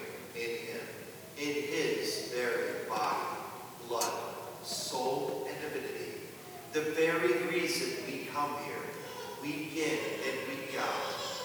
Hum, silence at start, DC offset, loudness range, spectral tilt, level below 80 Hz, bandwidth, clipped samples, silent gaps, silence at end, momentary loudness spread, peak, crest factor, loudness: none; 0 s; under 0.1%; 3 LU; -3 dB/octave; -78 dBFS; over 20 kHz; under 0.1%; none; 0 s; 12 LU; -18 dBFS; 18 dB; -35 LUFS